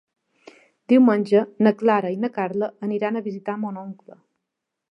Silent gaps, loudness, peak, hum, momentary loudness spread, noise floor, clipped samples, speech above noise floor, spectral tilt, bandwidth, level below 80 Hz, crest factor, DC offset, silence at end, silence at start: none; -21 LUFS; -4 dBFS; none; 13 LU; -82 dBFS; under 0.1%; 61 dB; -8.5 dB/octave; 5.8 kHz; -78 dBFS; 18 dB; under 0.1%; 1 s; 0.9 s